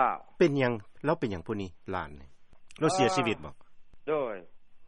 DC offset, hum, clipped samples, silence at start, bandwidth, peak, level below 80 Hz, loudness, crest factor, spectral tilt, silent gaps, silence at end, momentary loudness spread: under 0.1%; none; under 0.1%; 0 s; 10.5 kHz; -10 dBFS; -58 dBFS; -30 LUFS; 20 dB; -5.5 dB/octave; none; 0 s; 14 LU